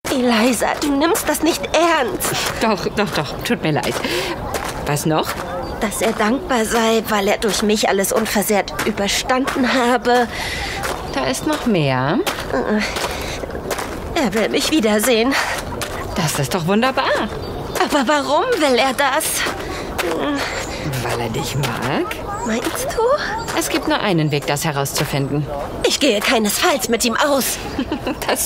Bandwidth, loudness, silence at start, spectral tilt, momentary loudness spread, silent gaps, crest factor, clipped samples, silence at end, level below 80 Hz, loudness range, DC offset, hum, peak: 16.5 kHz; -18 LUFS; 0.05 s; -4 dB/octave; 8 LU; none; 18 dB; under 0.1%; 0 s; -38 dBFS; 3 LU; under 0.1%; none; 0 dBFS